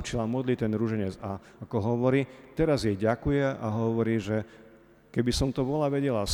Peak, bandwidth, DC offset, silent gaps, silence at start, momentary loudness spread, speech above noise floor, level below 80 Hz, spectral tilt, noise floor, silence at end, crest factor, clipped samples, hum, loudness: -12 dBFS; 19 kHz; under 0.1%; none; 0 s; 8 LU; 27 dB; -46 dBFS; -6.5 dB/octave; -55 dBFS; 0 s; 16 dB; under 0.1%; none; -28 LUFS